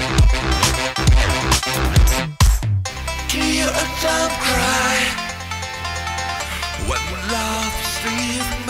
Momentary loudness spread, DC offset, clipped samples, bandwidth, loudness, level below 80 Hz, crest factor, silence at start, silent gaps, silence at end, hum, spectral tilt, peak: 8 LU; under 0.1%; under 0.1%; 16 kHz; -19 LUFS; -22 dBFS; 16 dB; 0 s; none; 0 s; none; -3.5 dB/octave; -2 dBFS